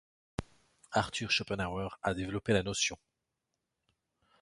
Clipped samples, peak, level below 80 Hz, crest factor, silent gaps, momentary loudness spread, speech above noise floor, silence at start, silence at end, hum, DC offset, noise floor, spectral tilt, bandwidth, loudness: under 0.1%; -14 dBFS; -56 dBFS; 22 dB; none; 13 LU; 52 dB; 0.4 s; 1.45 s; none; under 0.1%; -86 dBFS; -3.5 dB/octave; 11.5 kHz; -33 LUFS